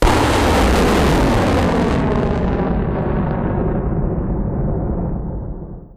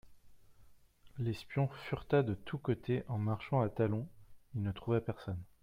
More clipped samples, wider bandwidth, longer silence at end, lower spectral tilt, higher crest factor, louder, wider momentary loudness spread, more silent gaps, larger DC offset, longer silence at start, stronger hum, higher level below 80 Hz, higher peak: neither; about the same, 15.5 kHz vs 15 kHz; second, 0 s vs 0.2 s; second, -6.5 dB/octave vs -9 dB/octave; second, 10 dB vs 20 dB; first, -17 LUFS vs -37 LUFS; about the same, 9 LU vs 10 LU; neither; neither; about the same, 0 s vs 0.05 s; neither; first, -22 dBFS vs -62 dBFS; first, -6 dBFS vs -18 dBFS